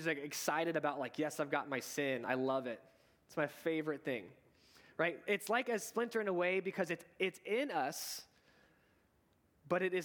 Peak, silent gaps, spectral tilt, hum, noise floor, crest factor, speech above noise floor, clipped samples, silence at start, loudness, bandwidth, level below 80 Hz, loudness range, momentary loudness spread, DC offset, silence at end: -18 dBFS; none; -4 dB/octave; none; -74 dBFS; 20 dB; 36 dB; under 0.1%; 0 s; -38 LUFS; 19 kHz; -84 dBFS; 3 LU; 7 LU; under 0.1%; 0 s